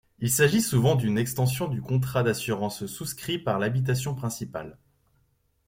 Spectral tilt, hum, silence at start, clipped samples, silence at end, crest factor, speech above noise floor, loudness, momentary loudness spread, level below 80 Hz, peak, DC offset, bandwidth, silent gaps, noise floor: -5 dB/octave; none; 0.2 s; under 0.1%; 0.95 s; 20 dB; 43 dB; -26 LUFS; 12 LU; -56 dBFS; -6 dBFS; under 0.1%; 16.5 kHz; none; -69 dBFS